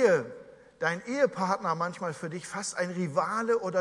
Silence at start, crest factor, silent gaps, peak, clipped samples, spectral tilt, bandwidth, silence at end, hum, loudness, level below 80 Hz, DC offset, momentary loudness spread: 0 s; 18 dB; none; -10 dBFS; under 0.1%; -5 dB/octave; 11.5 kHz; 0 s; none; -30 LUFS; -74 dBFS; under 0.1%; 9 LU